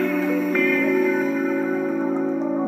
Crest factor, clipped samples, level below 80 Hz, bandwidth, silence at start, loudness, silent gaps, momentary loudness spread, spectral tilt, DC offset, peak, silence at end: 14 dB; under 0.1%; -78 dBFS; 15.5 kHz; 0 s; -21 LUFS; none; 5 LU; -7 dB/octave; under 0.1%; -8 dBFS; 0 s